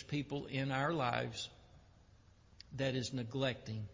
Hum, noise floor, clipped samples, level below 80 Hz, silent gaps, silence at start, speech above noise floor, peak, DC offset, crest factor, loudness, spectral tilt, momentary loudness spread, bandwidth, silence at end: none; -64 dBFS; under 0.1%; -64 dBFS; none; 0 s; 26 dB; -18 dBFS; under 0.1%; 22 dB; -39 LUFS; -5.5 dB/octave; 11 LU; 7.6 kHz; 0 s